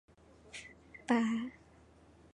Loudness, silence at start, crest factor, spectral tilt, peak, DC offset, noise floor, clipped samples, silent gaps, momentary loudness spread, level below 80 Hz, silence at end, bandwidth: -34 LUFS; 0.55 s; 22 dB; -5 dB/octave; -16 dBFS; under 0.1%; -62 dBFS; under 0.1%; none; 19 LU; -68 dBFS; 0.8 s; 10.5 kHz